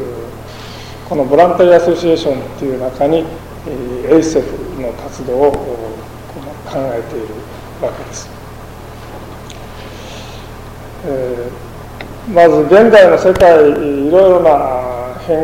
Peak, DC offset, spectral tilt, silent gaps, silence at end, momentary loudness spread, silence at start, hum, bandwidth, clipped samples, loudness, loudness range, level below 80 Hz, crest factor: 0 dBFS; under 0.1%; -6 dB/octave; none; 0 s; 23 LU; 0 s; none; 16.5 kHz; under 0.1%; -11 LUFS; 18 LU; -36 dBFS; 12 dB